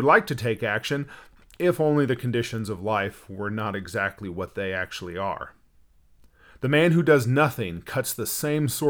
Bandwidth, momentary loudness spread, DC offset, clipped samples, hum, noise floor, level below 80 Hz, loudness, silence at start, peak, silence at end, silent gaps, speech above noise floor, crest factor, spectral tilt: 20 kHz; 13 LU; under 0.1%; under 0.1%; none; -57 dBFS; -56 dBFS; -25 LUFS; 0 s; -4 dBFS; 0 s; none; 33 dB; 22 dB; -5.5 dB/octave